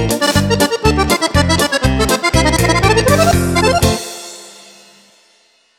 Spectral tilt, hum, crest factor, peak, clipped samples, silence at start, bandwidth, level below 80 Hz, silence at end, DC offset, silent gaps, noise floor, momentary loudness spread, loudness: -4.5 dB/octave; none; 12 dB; -2 dBFS; under 0.1%; 0 s; 18 kHz; -26 dBFS; 1.25 s; under 0.1%; none; -54 dBFS; 8 LU; -13 LUFS